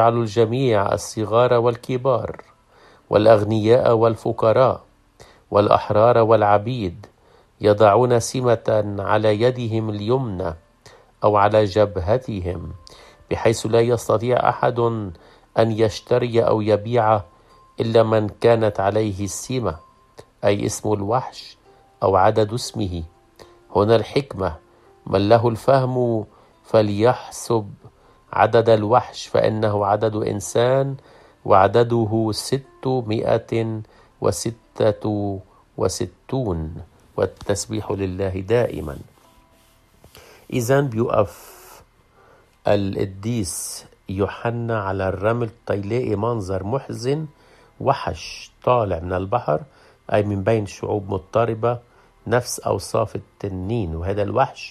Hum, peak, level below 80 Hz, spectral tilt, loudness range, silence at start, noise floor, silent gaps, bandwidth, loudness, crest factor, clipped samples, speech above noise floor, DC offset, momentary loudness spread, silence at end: none; -2 dBFS; -50 dBFS; -6 dB/octave; 6 LU; 0 s; -55 dBFS; none; 14.5 kHz; -20 LUFS; 20 dB; under 0.1%; 36 dB; under 0.1%; 12 LU; 0 s